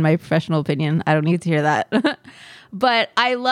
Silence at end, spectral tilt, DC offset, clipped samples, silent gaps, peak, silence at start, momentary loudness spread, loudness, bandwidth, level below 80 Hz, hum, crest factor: 0 s; -6.5 dB/octave; under 0.1%; under 0.1%; none; -4 dBFS; 0 s; 4 LU; -19 LUFS; 11 kHz; -62 dBFS; none; 16 dB